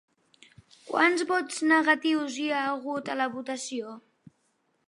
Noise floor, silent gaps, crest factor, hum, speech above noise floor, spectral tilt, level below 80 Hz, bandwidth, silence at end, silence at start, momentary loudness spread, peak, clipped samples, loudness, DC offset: -73 dBFS; none; 22 dB; none; 46 dB; -2.5 dB/octave; -80 dBFS; 11.5 kHz; 0.9 s; 0.85 s; 12 LU; -8 dBFS; under 0.1%; -27 LUFS; under 0.1%